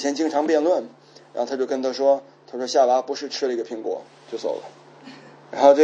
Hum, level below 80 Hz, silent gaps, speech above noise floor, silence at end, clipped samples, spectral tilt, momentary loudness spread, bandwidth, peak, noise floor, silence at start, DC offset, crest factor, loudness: none; -84 dBFS; none; 23 dB; 0 s; under 0.1%; -3.5 dB/octave; 17 LU; 8 kHz; -2 dBFS; -44 dBFS; 0 s; under 0.1%; 20 dB; -23 LUFS